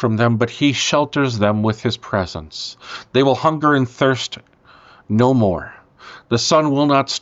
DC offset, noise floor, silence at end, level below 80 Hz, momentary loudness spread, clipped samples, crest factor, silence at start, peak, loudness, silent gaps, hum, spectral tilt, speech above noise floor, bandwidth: under 0.1%; -47 dBFS; 0.05 s; -50 dBFS; 13 LU; under 0.1%; 14 dB; 0 s; -4 dBFS; -17 LUFS; none; none; -5 dB/octave; 30 dB; 8 kHz